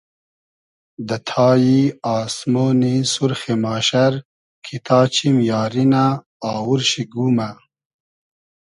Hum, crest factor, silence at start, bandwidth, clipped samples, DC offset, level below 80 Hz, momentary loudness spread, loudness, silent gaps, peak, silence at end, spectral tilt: none; 18 dB; 1 s; 11.5 kHz; under 0.1%; under 0.1%; -60 dBFS; 11 LU; -18 LUFS; 4.25-4.62 s, 6.26-6.40 s; -2 dBFS; 1.1 s; -5.5 dB/octave